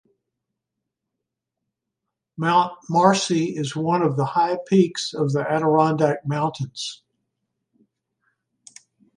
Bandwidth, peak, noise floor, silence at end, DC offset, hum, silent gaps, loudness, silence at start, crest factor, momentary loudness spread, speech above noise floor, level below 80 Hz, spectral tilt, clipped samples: 11 kHz; -2 dBFS; -83 dBFS; 2.2 s; under 0.1%; none; none; -21 LUFS; 2.4 s; 22 dB; 9 LU; 62 dB; -68 dBFS; -5.5 dB/octave; under 0.1%